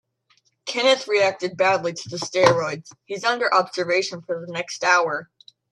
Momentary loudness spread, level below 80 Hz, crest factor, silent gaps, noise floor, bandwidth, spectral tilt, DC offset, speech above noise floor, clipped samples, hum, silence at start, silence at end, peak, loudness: 12 LU; -70 dBFS; 22 dB; none; -64 dBFS; 11.5 kHz; -3 dB/octave; under 0.1%; 43 dB; under 0.1%; none; 0.65 s; 0.45 s; 0 dBFS; -21 LUFS